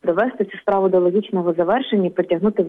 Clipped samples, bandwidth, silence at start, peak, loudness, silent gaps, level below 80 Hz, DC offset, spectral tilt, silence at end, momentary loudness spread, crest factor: under 0.1%; 3.9 kHz; 0.05 s; -6 dBFS; -19 LUFS; none; -60 dBFS; under 0.1%; -9.5 dB/octave; 0 s; 5 LU; 12 dB